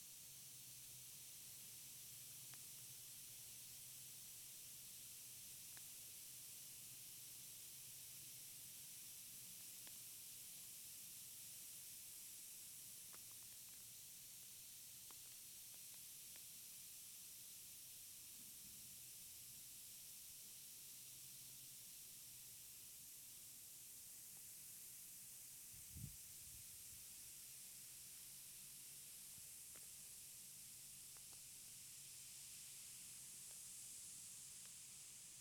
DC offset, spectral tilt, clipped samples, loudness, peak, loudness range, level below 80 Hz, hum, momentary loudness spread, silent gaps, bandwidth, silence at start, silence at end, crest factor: under 0.1%; 0 dB/octave; under 0.1%; -55 LUFS; -38 dBFS; 1 LU; -82 dBFS; none; 2 LU; none; over 20 kHz; 0 s; 0 s; 20 dB